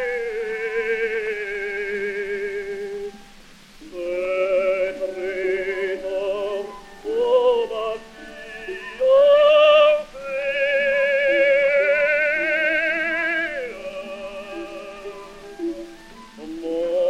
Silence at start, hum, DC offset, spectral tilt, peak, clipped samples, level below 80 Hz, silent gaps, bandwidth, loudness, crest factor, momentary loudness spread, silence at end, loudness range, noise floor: 0 s; none; under 0.1%; -3.5 dB/octave; -6 dBFS; under 0.1%; -52 dBFS; none; 11 kHz; -20 LUFS; 16 dB; 19 LU; 0 s; 11 LU; -46 dBFS